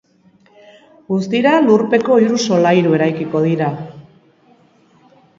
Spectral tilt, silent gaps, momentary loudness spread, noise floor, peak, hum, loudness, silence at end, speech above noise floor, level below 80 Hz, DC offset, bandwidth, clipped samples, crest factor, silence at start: -6 dB/octave; none; 9 LU; -52 dBFS; 0 dBFS; none; -14 LUFS; 1.4 s; 38 dB; -62 dBFS; under 0.1%; 7.6 kHz; under 0.1%; 16 dB; 1.1 s